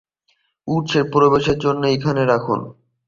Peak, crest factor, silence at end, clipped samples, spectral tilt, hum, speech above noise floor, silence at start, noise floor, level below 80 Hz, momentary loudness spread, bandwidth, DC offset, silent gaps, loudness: -2 dBFS; 16 dB; 0.35 s; under 0.1%; -6.5 dB/octave; none; 49 dB; 0.65 s; -66 dBFS; -48 dBFS; 10 LU; 7.4 kHz; under 0.1%; none; -18 LUFS